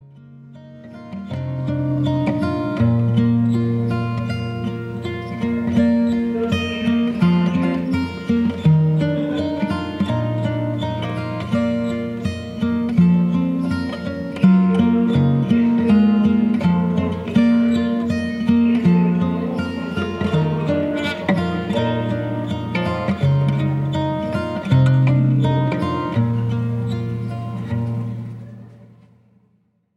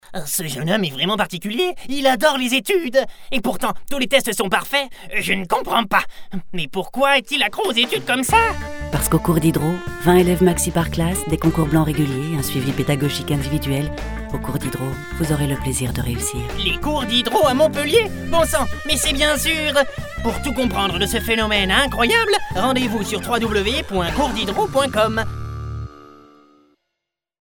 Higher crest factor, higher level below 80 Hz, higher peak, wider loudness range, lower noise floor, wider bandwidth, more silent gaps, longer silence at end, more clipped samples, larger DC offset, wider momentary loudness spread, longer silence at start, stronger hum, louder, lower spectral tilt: about the same, 16 dB vs 20 dB; second, -46 dBFS vs -34 dBFS; about the same, -2 dBFS vs 0 dBFS; about the same, 5 LU vs 5 LU; second, -62 dBFS vs -81 dBFS; second, 9.6 kHz vs over 20 kHz; neither; second, 1.1 s vs 1.4 s; neither; neither; about the same, 10 LU vs 9 LU; about the same, 0.2 s vs 0.1 s; neither; about the same, -19 LUFS vs -19 LUFS; first, -8.5 dB/octave vs -4 dB/octave